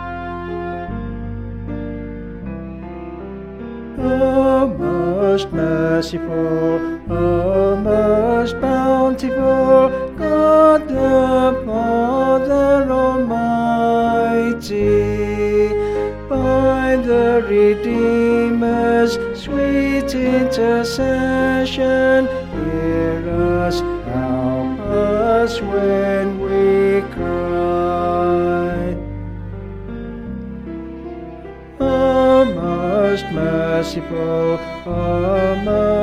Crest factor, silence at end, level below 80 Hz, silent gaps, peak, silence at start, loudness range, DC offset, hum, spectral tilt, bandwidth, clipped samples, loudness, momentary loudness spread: 16 dB; 0 s; -34 dBFS; none; -2 dBFS; 0 s; 7 LU; under 0.1%; none; -7 dB/octave; 14 kHz; under 0.1%; -17 LUFS; 15 LU